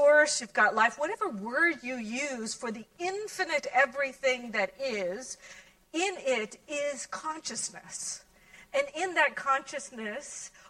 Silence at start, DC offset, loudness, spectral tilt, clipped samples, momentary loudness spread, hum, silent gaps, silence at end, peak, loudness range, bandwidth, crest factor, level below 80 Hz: 0 s; under 0.1%; -30 LUFS; -1.5 dB/octave; under 0.1%; 12 LU; none; none; 0.2 s; -12 dBFS; 5 LU; 13 kHz; 20 dB; -70 dBFS